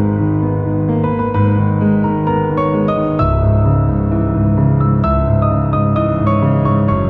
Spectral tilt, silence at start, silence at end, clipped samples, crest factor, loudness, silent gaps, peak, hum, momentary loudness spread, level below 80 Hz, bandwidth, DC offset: -12 dB/octave; 0 s; 0 s; under 0.1%; 12 dB; -15 LUFS; none; -2 dBFS; none; 3 LU; -26 dBFS; 4.3 kHz; under 0.1%